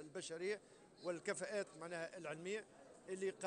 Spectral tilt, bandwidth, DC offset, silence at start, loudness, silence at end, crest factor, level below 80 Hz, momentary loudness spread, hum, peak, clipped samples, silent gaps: -3.5 dB/octave; 10 kHz; under 0.1%; 0 s; -47 LUFS; 0 s; 20 dB; -88 dBFS; 8 LU; none; -28 dBFS; under 0.1%; none